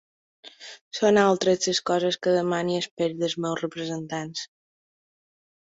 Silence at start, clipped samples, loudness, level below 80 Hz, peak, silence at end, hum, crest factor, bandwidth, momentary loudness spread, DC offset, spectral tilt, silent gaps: 0.45 s; under 0.1%; -24 LUFS; -68 dBFS; -6 dBFS; 1.15 s; none; 20 dB; 8 kHz; 16 LU; under 0.1%; -4 dB/octave; 0.81-0.91 s, 2.91-2.97 s